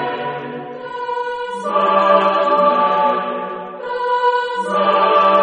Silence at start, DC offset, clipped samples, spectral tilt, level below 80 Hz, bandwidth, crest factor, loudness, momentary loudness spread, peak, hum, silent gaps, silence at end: 0 s; under 0.1%; under 0.1%; -5.5 dB/octave; -66 dBFS; 10 kHz; 16 dB; -16 LUFS; 14 LU; 0 dBFS; none; none; 0 s